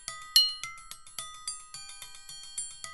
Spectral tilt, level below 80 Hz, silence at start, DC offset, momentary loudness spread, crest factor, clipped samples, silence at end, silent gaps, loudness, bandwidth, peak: 3 dB/octave; -62 dBFS; 0 s; under 0.1%; 21 LU; 30 dB; under 0.1%; 0 s; none; -28 LUFS; 12 kHz; -4 dBFS